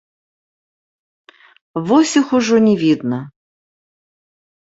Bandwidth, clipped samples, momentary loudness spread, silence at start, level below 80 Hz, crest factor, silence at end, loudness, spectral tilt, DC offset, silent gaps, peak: 8 kHz; under 0.1%; 13 LU; 1.75 s; -62 dBFS; 18 dB; 1.4 s; -15 LUFS; -5 dB/octave; under 0.1%; none; -2 dBFS